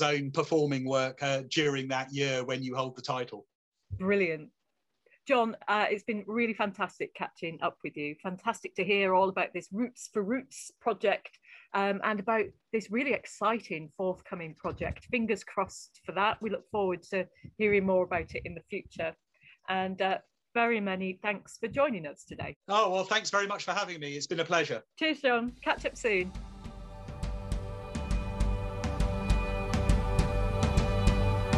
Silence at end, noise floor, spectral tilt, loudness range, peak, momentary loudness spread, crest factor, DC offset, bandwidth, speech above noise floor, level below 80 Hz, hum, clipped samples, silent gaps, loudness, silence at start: 0 s; -83 dBFS; -5 dB/octave; 3 LU; -12 dBFS; 11 LU; 20 dB; under 0.1%; 12 kHz; 52 dB; -40 dBFS; none; under 0.1%; 3.55-3.72 s, 22.56-22.61 s; -31 LUFS; 0 s